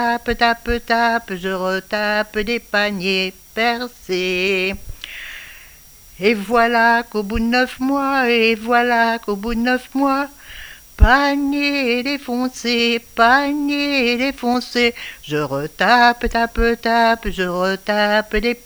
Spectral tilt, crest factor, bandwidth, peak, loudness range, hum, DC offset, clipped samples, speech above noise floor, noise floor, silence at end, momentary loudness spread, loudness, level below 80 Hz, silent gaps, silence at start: -4.5 dB/octave; 18 dB; over 20 kHz; 0 dBFS; 4 LU; none; under 0.1%; under 0.1%; 26 dB; -44 dBFS; 0.1 s; 10 LU; -17 LUFS; -32 dBFS; none; 0 s